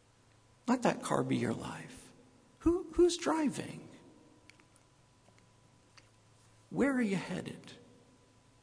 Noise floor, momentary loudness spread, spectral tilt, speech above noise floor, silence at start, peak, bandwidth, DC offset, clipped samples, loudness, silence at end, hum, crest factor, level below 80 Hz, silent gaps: -65 dBFS; 21 LU; -5.5 dB/octave; 33 dB; 0.65 s; -14 dBFS; 11 kHz; under 0.1%; under 0.1%; -33 LUFS; 0.85 s; none; 22 dB; -60 dBFS; none